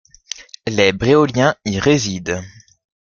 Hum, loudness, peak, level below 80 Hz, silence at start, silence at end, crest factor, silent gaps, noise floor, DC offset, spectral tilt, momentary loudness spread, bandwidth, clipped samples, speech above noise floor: none; -17 LUFS; 0 dBFS; -46 dBFS; 0.4 s; 0.55 s; 18 dB; none; -35 dBFS; under 0.1%; -5 dB/octave; 17 LU; 7.2 kHz; under 0.1%; 19 dB